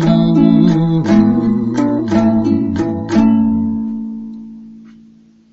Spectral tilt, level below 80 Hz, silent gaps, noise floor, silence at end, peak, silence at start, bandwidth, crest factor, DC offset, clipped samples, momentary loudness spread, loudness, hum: -8.5 dB/octave; -40 dBFS; none; -45 dBFS; 0.7 s; 0 dBFS; 0 s; 7.6 kHz; 14 dB; under 0.1%; under 0.1%; 15 LU; -13 LUFS; none